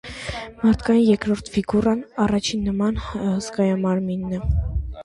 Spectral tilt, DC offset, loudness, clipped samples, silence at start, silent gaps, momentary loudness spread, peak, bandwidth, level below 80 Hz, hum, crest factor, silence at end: -6.5 dB/octave; under 0.1%; -22 LUFS; under 0.1%; 0.05 s; none; 8 LU; -6 dBFS; 11.5 kHz; -32 dBFS; none; 16 dB; 0 s